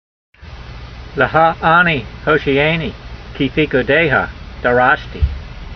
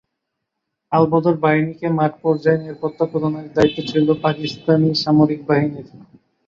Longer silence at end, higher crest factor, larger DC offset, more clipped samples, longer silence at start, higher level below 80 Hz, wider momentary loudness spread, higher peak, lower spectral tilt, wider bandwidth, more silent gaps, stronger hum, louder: second, 0 s vs 0.5 s; about the same, 16 dB vs 16 dB; neither; neither; second, 0.4 s vs 0.9 s; first, -30 dBFS vs -56 dBFS; first, 21 LU vs 7 LU; about the same, 0 dBFS vs -2 dBFS; about the same, -7.5 dB/octave vs -7.5 dB/octave; second, 6.4 kHz vs 7.4 kHz; neither; neither; first, -15 LUFS vs -18 LUFS